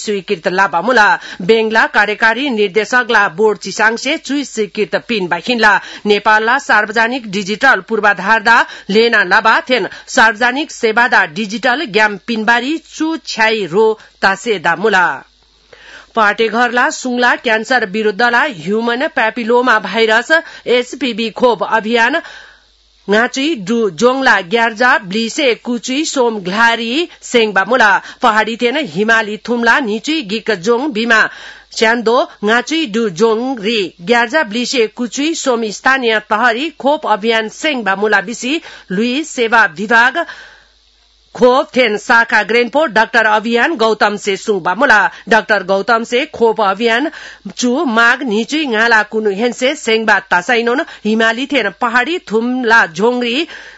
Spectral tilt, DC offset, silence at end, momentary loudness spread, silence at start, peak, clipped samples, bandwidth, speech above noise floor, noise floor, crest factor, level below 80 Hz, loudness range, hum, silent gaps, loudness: -3.5 dB/octave; under 0.1%; 0.1 s; 7 LU; 0 s; 0 dBFS; 0.2%; 8.4 kHz; 38 dB; -51 dBFS; 14 dB; -54 dBFS; 3 LU; none; none; -13 LUFS